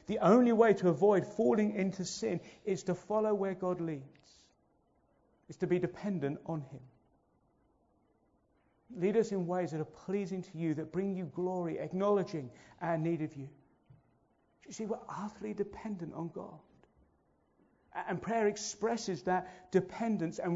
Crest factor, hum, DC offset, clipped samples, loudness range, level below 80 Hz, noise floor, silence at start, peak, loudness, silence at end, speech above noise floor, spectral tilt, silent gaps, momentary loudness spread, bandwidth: 22 dB; none; under 0.1%; under 0.1%; 10 LU; -72 dBFS; -73 dBFS; 0.1 s; -14 dBFS; -34 LUFS; 0 s; 39 dB; -6.5 dB/octave; none; 15 LU; 7.6 kHz